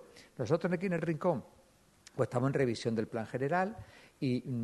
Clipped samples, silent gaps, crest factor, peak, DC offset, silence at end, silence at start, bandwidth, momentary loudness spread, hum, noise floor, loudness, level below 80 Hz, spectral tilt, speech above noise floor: under 0.1%; none; 18 dB; -16 dBFS; under 0.1%; 0 s; 0 s; 12 kHz; 8 LU; none; -63 dBFS; -34 LUFS; -68 dBFS; -7 dB/octave; 30 dB